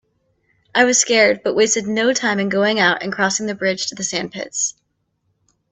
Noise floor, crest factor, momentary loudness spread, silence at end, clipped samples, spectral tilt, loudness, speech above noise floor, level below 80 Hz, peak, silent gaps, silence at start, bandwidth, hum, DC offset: -69 dBFS; 18 dB; 9 LU; 1 s; under 0.1%; -2 dB/octave; -17 LUFS; 52 dB; -62 dBFS; 0 dBFS; none; 0.75 s; 8.6 kHz; none; under 0.1%